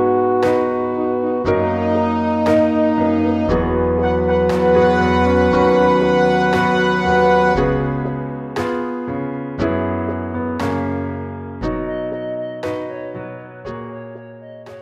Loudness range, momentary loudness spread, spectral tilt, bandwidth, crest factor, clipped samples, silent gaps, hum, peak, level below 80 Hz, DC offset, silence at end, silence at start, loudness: 10 LU; 15 LU; -7.5 dB/octave; 10.5 kHz; 14 dB; under 0.1%; none; none; -2 dBFS; -36 dBFS; under 0.1%; 0 s; 0 s; -17 LUFS